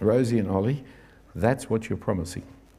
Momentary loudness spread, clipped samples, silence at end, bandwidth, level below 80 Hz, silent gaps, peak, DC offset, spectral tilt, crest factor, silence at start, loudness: 13 LU; under 0.1%; 0.25 s; 15 kHz; -54 dBFS; none; -6 dBFS; under 0.1%; -7.5 dB/octave; 20 dB; 0 s; -26 LUFS